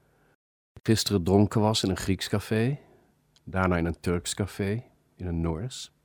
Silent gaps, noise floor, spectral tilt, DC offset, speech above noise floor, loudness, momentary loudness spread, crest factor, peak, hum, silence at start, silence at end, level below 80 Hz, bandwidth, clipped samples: none; -64 dBFS; -5.5 dB/octave; under 0.1%; 37 dB; -27 LUFS; 11 LU; 22 dB; -6 dBFS; none; 0.75 s; 0.2 s; -48 dBFS; over 20 kHz; under 0.1%